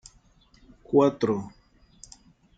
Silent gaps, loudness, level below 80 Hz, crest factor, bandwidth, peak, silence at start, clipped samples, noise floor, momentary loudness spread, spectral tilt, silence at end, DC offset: none; -24 LUFS; -60 dBFS; 20 dB; 9 kHz; -8 dBFS; 0.9 s; under 0.1%; -59 dBFS; 27 LU; -7 dB/octave; 1.1 s; under 0.1%